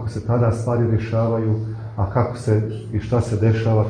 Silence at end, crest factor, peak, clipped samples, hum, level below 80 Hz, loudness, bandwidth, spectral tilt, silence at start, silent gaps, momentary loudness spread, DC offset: 0 s; 14 dB; -6 dBFS; under 0.1%; none; -42 dBFS; -21 LUFS; 9.8 kHz; -8.5 dB/octave; 0 s; none; 7 LU; under 0.1%